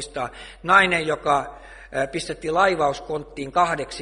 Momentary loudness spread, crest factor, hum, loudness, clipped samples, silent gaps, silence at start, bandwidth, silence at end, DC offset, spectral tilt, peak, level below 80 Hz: 15 LU; 22 dB; none; -22 LUFS; under 0.1%; none; 0 s; 11.5 kHz; 0 s; under 0.1%; -4 dB/octave; 0 dBFS; -48 dBFS